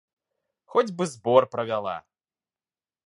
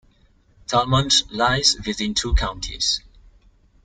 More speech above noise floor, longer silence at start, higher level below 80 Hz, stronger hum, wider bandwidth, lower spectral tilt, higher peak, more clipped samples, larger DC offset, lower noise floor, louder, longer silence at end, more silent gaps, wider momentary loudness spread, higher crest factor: first, over 66 dB vs 36 dB; about the same, 0.75 s vs 0.7 s; second, -72 dBFS vs -30 dBFS; neither; first, 11.5 kHz vs 10 kHz; first, -5.5 dB/octave vs -3 dB/octave; about the same, -4 dBFS vs -2 dBFS; neither; neither; first, under -90 dBFS vs -57 dBFS; second, -25 LUFS vs -20 LUFS; first, 1.1 s vs 0.85 s; neither; first, 11 LU vs 8 LU; about the same, 24 dB vs 20 dB